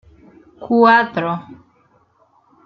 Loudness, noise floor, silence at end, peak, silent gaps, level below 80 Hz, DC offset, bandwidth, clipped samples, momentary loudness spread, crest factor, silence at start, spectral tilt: -15 LUFS; -57 dBFS; 1.1 s; -2 dBFS; none; -60 dBFS; under 0.1%; 6.2 kHz; under 0.1%; 17 LU; 18 dB; 0.6 s; -7.5 dB/octave